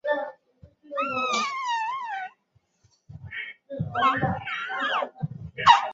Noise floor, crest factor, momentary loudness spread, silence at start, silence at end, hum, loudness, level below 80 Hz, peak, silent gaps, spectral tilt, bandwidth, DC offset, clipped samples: -68 dBFS; 24 dB; 13 LU; 0.05 s; 0 s; none; -26 LUFS; -56 dBFS; -2 dBFS; none; -4 dB/octave; 7.8 kHz; under 0.1%; under 0.1%